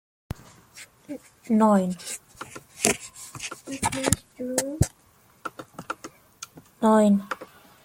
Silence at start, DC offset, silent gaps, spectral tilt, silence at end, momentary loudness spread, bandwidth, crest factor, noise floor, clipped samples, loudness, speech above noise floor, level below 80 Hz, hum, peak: 0.75 s; under 0.1%; none; -4.5 dB/octave; 0.4 s; 23 LU; 16.5 kHz; 26 dB; -59 dBFS; under 0.1%; -25 LUFS; 37 dB; -48 dBFS; none; 0 dBFS